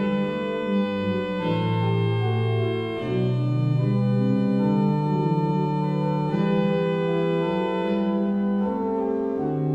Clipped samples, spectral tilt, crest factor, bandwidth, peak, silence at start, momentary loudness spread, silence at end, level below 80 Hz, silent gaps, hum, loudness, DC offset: under 0.1%; -9.5 dB/octave; 12 dB; 7.6 kHz; -10 dBFS; 0 s; 4 LU; 0 s; -56 dBFS; none; none; -24 LUFS; under 0.1%